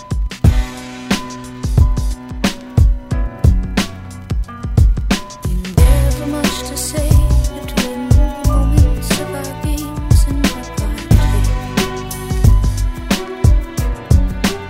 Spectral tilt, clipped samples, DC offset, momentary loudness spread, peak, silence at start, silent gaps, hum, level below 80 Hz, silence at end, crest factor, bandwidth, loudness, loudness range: -5.5 dB/octave; under 0.1%; under 0.1%; 10 LU; -2 dBFS; 0 s; none; none; -16 dBFS; 0 s; 12 dB; 16.5 kHz; -17 LUFS; 2 LU